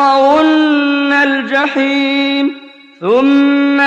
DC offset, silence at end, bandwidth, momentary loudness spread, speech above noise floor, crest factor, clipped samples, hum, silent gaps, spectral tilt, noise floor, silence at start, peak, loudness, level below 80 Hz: under 0.1%; 0 s; 7.6 kHz; 6 LU; 22 dB; 8 dB; under 0.1%; none; none; -4.5 dB/octave; -32 dBFS; 0 s; -2 dBFS; -11 LUFS; -58 dBFS